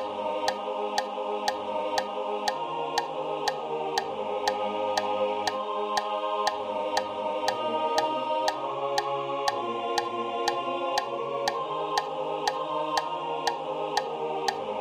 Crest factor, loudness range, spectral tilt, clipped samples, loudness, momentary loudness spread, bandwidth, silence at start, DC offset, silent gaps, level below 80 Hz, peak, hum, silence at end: 20 dB; 2 LU; -2.5 dB/octave; under 0.1%; -29 LUFS; 3 LU; 16 kHz; 0 s; under 0.1%; none; -70 dBFS; -10 dBFS; none; 0 s